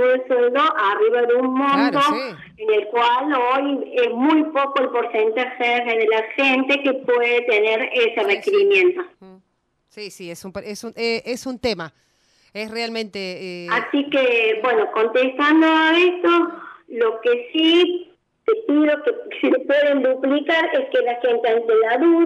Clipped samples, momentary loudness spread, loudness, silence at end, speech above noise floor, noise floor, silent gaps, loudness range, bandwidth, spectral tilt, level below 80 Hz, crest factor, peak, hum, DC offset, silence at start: under 0.1%; 13 LU; -18 LUFS; 0 s; 50 dB; -69 dBFS; none; 8 LU; 12.5 kHz; -4 dB/octave; -62 dBFS; 14 dB; -6 dBFS; none; under 0.1%; 0 s